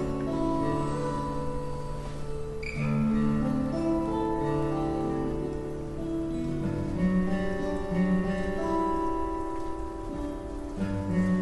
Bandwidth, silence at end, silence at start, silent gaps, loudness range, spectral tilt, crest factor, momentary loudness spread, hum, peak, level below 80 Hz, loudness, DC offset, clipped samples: 11.5 kHz; 0 s; 0 s; none; 2 LU; -8 dB/octave; 14 dB; 9 LU; none; -14 dBFS; -40 dBFS; -30 LUFS; under 0.1%; under 0.1%